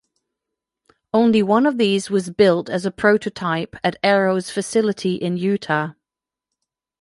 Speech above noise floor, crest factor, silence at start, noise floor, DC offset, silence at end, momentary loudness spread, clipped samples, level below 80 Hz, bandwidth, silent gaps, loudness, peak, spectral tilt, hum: 69 dB; 18 dB; 1.15 s; -88 dBFS; under 0.1%; 1.1 s; 7 LU; under 0.1%; -60 dBFS; 11.5 kHz; none; -19 LUFS; -2 dBFS; -5.5 dB/octave; none